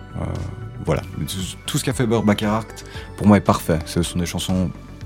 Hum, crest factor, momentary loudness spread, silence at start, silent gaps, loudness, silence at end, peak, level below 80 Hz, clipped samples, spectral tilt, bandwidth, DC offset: none; 22 dB; 14 LU; 0 s; none; -21 LUFS; 0 s; 0 dBFS; -38 dBFS; under 0.1%; -5.5 dB/octave; 17 kHz; under 0.1%